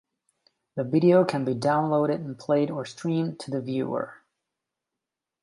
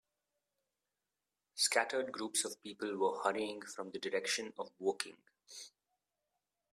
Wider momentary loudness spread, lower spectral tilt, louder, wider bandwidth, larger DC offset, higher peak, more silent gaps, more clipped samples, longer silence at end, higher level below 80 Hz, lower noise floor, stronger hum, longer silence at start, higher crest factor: second, 13 LU vs 19 LU; first, -7.5 dB/octave vs -1 dB/octave; first, -25 LUFS vs -37 LUFS; second, 11.5 kHz vs 15 kHz; neither; first, -8 dBFS vs -14 dBFS; neither; neither; first, 1.3 s vs 1.05 s; first, -72 dBFS vs -86 dBFS; about the same, -87 dBFS vs under -90 dBFS; neither; second, 0.75 s vs 1.55 s; second, 18 dB vs 26 dB